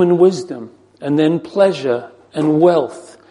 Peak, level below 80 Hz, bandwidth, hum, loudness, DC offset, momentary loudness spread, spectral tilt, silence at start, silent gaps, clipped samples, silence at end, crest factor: 0 dBFS; -64 dBFS; 10.5 kHz; none; -15 LUFS; under 0.1%; 16 LU; -7 dB/octave; 0 s; none; under 0.1%; 0.25 s; 14 dB